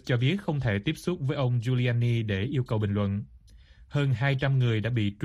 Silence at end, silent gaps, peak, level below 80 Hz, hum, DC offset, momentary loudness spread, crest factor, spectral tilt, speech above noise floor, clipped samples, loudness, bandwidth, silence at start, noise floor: 0 s; none; -12 dBFS; -52 dBFS; none; under 0.1%; 5 LU; 14 dB; -7.5 dB/octave; 27 dB; under 0.1%; -27 LUFS; 11.5 kHz; 0.05 s; -53 dBFS